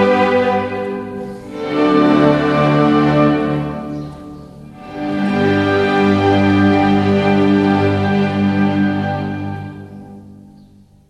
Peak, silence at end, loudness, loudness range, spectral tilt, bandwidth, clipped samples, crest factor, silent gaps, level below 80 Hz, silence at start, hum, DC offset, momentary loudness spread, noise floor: 0 dBFS; 0.75 s; -15 LUFS; 4 LU; -8 dB/octave; 9.6 kHz; under 0.1%; 14 dB; none; -46 dBFS; 0 s; none; under 0.1%; 16 LU; -45 dBFS